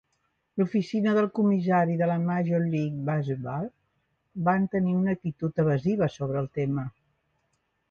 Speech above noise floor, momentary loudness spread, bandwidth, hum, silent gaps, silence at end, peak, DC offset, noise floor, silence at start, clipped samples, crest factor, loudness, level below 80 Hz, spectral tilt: 49 dB; 9 LU; 6.8 kHz; none; none; 1 s; -10 dBFS; under 0.1%; -75 dBFS; 0.55 s; under 0.1%; 16 dB; -27 LUFS; -62 dBFS; -9 dB/octave